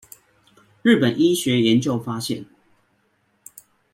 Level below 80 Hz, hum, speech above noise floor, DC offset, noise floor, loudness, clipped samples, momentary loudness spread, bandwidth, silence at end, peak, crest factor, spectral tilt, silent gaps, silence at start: -62 dBFS; none; 47 dB; under 0.1%; -66 dBFS; -20 LUFS; under 0.1%; 10 LU; 16.5 kHz; 1.5 s; -4 dBFS; 18 dB; -5 dB/octave; none; 0.85 s